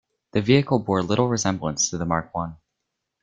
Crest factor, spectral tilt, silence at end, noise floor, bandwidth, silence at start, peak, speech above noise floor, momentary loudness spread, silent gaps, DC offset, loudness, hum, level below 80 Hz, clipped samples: 20 dB; -4.5 dB/octave; 0.65 s; -80 dBFS; 9.4 kHz; 0.35 s; -4 dBFS; 58 dB; 10 LU; none; under 0.1%; -23 LUFS; none; -52 dBFS; under 0.1%